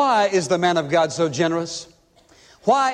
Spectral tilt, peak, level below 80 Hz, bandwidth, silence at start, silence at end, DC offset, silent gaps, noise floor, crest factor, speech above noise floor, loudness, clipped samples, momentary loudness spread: -4.5 dB/octave; -4 dBFS; -62 dBFS; 11 kHz; 0 s; 0 s; under 0.1%; none; -54 dBFS; 16 dB; 35 dB; -20 LUFS; under 0.1%; 8 LU